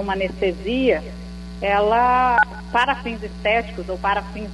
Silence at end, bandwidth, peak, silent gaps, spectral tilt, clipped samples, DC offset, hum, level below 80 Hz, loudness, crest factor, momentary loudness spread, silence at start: 0 s; 11.5 kHz; -6 dBFS; none; -6 dB/octave; under 0.1%; under 0.1%; 60 Hz at -35 dBFS; -36 dBFS; -20 LUFS; 16 dB; 13 LU; 0 s